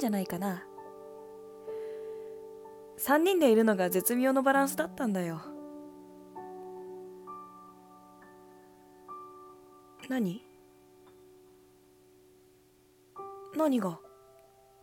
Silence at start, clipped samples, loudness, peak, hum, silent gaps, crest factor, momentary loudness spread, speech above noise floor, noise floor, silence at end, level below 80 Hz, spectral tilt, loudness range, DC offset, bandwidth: 0 s; under 0.1%; -29 LUFS; -12 dBFS; none; none; 22 dB; 24 LU; 35 dB; -63 dBFS; 0.75 s; -74 dBFS; -5 dB/octave; 20 LU; under 0.1%; 17.5 kHz